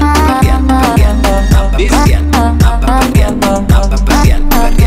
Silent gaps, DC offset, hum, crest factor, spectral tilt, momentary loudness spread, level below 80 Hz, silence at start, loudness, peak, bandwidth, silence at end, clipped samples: none; under 0.1%; none; 8 dB; -6 dB/octave; 2 LU; -10 dBFS; 0 s; -10 LUFS; 0 dBFS; 16 kHz; 0 s; under 0.1%